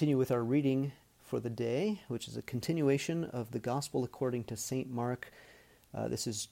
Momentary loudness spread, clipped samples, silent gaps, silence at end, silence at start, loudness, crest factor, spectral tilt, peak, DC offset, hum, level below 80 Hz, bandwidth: 10 LU; under 0.1%; none; 0.05 s; 0 s; -35 LUFS; 16 dB; -6 dB/octave; -18 dBFS; under 0.1%; none; -68 dBFS; 16.5 kHz